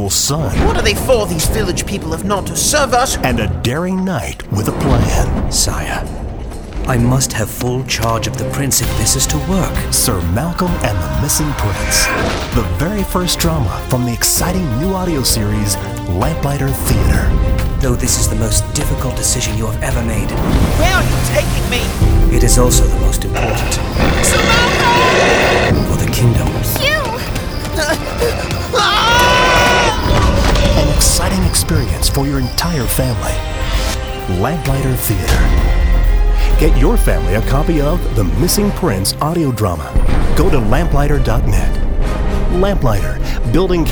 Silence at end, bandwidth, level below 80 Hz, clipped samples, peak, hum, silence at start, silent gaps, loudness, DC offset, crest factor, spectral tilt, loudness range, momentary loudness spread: 0 s; over 20 kHz; -18 dBFS; under 0.1%; 0 dBFS; none; 0 s; none; -14 LUFS; under 0.1%; 14 dB; -4 dB/octave; 4 LU; 7 LU